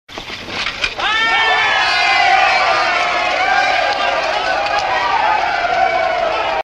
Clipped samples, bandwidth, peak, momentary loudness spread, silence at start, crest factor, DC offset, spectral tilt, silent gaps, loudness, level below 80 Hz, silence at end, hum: under 0.1%; 11 kHz; 0 dBFS; 7 LU; 0.1 s; 16 dB; under 0.1%; -1.5 dB/octave; none; -14 LUFS; -44 dBFS; 0 s; none